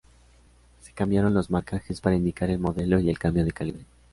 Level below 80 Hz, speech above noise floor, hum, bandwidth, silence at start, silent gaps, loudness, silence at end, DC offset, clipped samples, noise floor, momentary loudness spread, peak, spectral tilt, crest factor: -42 dBFS; 32 dB; none; 11.5 kHz; 0.85 s; none; -26 LUFS; 0.3 s; under 0.1%; under 0.1%; -56 dBFS; 11 LU; -8 dBFS; -8 dB/octave; 18 dB